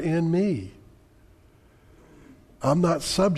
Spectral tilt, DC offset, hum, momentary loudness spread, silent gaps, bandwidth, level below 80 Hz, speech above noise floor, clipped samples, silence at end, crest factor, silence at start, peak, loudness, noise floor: -6 dB/octave; under 0.1%; none; 9 LU; none; 13.5 kHz; -52 dBFS; 33 dB; under 0.1%; 0 s; 18 dB; 0 s; -10 dBFS; -24 LUFS; -56 dBFS